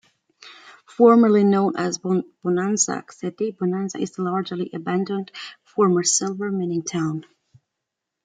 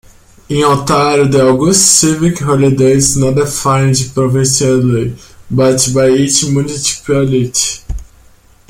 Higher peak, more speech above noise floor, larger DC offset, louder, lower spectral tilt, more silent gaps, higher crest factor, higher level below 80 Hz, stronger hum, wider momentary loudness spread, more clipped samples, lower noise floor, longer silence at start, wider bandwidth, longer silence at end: about the same, -2 dBFS vs 0 dBFS; first, 61 dB vs 33 dB; neither; second, -21 LUFS vs -11 LUFS; about the same, -5 dB/octave vs -4.5 dB/octave; neither; first, 20 dB vs 12 dB; second, -70 dBFS vs -34 dBFS; neither; first, 14 LU vs 8 LU; neither; first, -82 dBFS vs -44 dBFS; about the same, 0.45 s vs 0.5 s; second, 9.6 kHz vs 16.5 kHz; first, 1.05 s vs 0.65 s